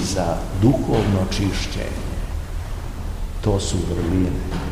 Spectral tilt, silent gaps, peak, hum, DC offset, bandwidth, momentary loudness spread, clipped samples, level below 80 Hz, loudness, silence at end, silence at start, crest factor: -6 dB/octave; none; -4 dBFS; none; 0.7%; 15.5 kHz; 12 LU; under 0.1%; -28 dBFS; -23 LUFS; 0 s; 0 s; 16 dB